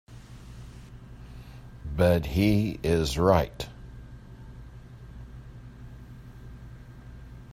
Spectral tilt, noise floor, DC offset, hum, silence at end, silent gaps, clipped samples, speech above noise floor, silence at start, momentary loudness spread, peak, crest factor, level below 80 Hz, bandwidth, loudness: -6.5 dB/octave; -45 dBFS; under 0.1%; none; 0 s; none; under 0.1%; 22 dB; 0.1 s; 24 LU; -6 dBFS; 24 dB; -44 dBFS; 16 kHz; -25 LUFS